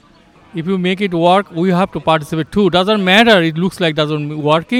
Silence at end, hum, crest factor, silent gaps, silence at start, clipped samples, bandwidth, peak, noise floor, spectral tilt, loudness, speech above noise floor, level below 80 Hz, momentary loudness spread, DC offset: 0 s; none; 14 dB; none; 0.55 s; under 0.1%; 15 kHz; 0 dBFS; -46 dBFS; -6 dB/octave; -14 LUFS; 33 dB; -48 dBFS; 9 LU; under 0.1%